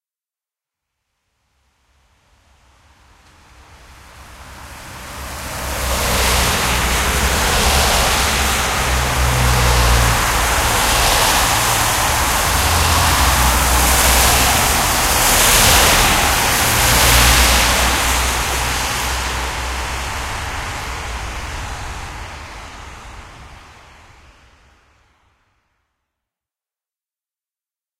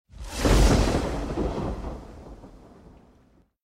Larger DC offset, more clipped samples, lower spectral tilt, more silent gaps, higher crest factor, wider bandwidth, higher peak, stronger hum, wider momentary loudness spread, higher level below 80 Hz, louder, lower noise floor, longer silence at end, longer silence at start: neither; neither; second, -2 dB/octave vs -5.5 dB/octave; neither; about the same, 18 dB vs 20 dB; about the same, 16 kHz vs 15 kHz; first, 0 dBFS vs -8 dBFS; neither; second, 18 LU vs 25 LU; about the same, -24 dBFS vs -28 dBFS; first, -14 LUFS vs -25 LUFS; first, under -90 dBFS vs -60 dBFS; first, 4.4 s vs 1.1 s; first, 3.9 s vs 0.2 s